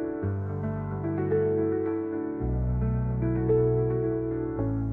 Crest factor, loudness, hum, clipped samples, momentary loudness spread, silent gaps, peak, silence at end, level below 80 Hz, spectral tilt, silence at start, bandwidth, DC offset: 14 dB; -28 LUFS; none; under 0.1%; 7 LU; none; -14 dBFS; 0 s; -38 dBFS; -13 dB/octave; 0 s; 2.8 kHz; under 0.1%